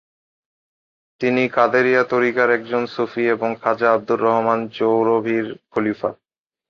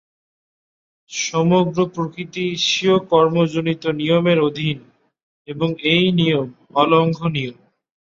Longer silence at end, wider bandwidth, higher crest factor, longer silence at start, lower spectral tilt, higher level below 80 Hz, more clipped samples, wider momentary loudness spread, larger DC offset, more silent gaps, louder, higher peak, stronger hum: about the same, 0.55 s vs 0.6 s; second, 6.8 kHz vs 7.6 kHz; about the same, 18 dB vs 18 dB; about the same, 1.2 s vs 1.1 s; first, -7 dB/octave vs -5.5 dB/octave; second, -64 dBFS vs -58 dBFS; neither; about the same, 8 LU vs 10 LU; neither; second, none vs 5.23-5.45 s; about the same, -19 LUFS vs -18 LUFS; about the same, -2 dBFS vs -2 dBFS; neither